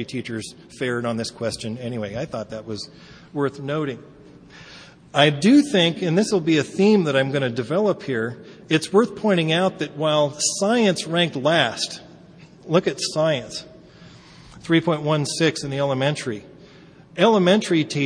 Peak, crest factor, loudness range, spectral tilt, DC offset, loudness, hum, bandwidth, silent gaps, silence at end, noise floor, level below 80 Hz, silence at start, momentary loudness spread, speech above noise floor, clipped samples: -2 dBFS; 20 dB; 9 LU; -5 dB/octave; under 0.1%; -21 LUFS; none; 10.5 kHz; none; 0 s; -47 dBFS; -60 dBFS; 0 s; 15 LU; 26 dB; under 0.1%